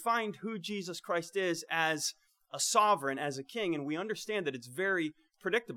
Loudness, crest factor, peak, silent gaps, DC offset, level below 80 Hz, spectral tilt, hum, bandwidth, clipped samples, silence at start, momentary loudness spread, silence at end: -33 LUFS; 20 dB; -12 dBFS; none; under 0.1%; -84 dBFS; -3 dB/octave; none; 18.5 kHz; under 0.1%; 0 s; 10 LU; 0 s